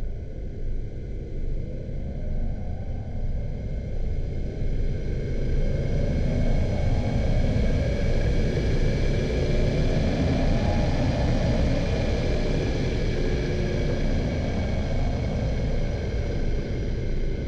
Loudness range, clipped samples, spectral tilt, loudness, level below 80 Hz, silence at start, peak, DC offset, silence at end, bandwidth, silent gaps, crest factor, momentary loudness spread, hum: 8 LU; under 0.1%; -7.5 dB/octave; -27 LUFS; -26 dBFS; 0 s; -12 dBFS; 0.4%; 0 s; 7.6 kHz; none; 12 dB; 9 LU; none